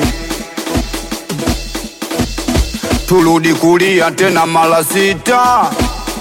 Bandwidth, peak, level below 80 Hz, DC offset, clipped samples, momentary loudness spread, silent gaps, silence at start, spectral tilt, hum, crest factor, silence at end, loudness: 16.5 kHz; -2 dBFS; -26 dBFS; under 0.1%; under 0.1%; 11 LU; none; 0 s; -4.5 dB/octave; none; 12 dB; 0 s; -13 LUFS